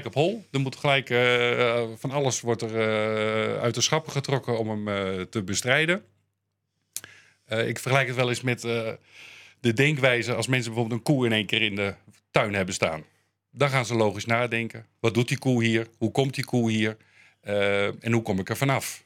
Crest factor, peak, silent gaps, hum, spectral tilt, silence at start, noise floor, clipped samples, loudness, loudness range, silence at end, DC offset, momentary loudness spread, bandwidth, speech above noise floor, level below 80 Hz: 24 dB; -2 dBFS; none; none; -4.5 dB/octave; 0 s; -79 dBFS; under 0.1%; -25 LUFS; 4 LU; 0.1 s; under 0.1%; 8 LU; 16.5 kHz; 53 dB; -68 dBFS